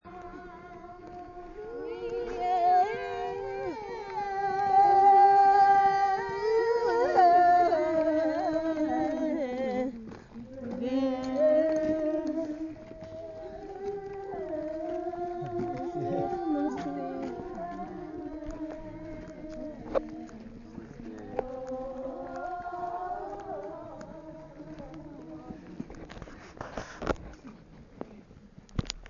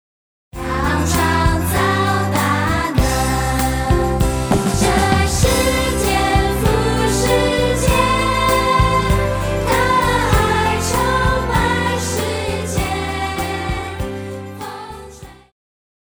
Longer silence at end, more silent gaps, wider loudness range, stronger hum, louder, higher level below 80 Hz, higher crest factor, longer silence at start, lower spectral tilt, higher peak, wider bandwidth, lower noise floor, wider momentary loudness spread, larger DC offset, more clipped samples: second, 0 s vs 0.75 s; neither; first, 18 LU vs 6 LU; neither; second, -28 LUFS vs -17 LUFS; second, -52 dBFS vs -24 dBFS; first, 20 dB vs 14 dB; second, 0.05 s vs 0.55 s; first, -6.5 dB/octave vs -4.5 dB/octave; second, -10 dBFS vs -2 dBFS; second, 7.2 kHz vs over 20 kHz; first, -53 dBFS vs -38 dBFS; first, 23 LU vs 9 LU; neither; neither